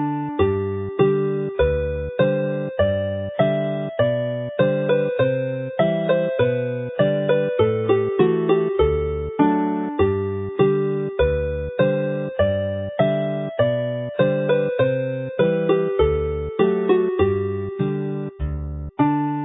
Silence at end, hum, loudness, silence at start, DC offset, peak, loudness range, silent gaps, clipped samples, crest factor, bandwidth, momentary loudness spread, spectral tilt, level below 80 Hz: 0 s; none; -21 LUFS; 0 s; under 0.1%; -4 dBFS; 2 LU; none; under 0.1%; 18 dB; 4 kHz; 7 LU; -12 dB/octave; -36 dBFS